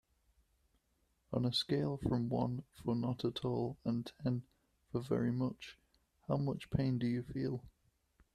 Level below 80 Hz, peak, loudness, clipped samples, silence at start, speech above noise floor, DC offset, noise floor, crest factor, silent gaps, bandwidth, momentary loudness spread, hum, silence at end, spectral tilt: -62 dBFS; -20 dBFS; -38 LUFS; under 0.1%; 1.3 s; 41 dB; under 0.1%; -78 dBFS; 18 dB; none; 13.5 kHz; 8 LU; none; 0.65 s; -7.5 dB/octave